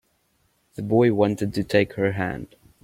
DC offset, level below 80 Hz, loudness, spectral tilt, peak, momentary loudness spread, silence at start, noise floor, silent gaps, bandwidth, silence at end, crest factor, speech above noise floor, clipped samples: under 0.1%; -54 dBFS; -22 LUFS; -7 dB/octave; -6 dBFS; 16 LU; 0.8 s; -67 dBFS; none; 16.5 kHz; 0.35 s; 18 dB; 45 dB; under 0.1%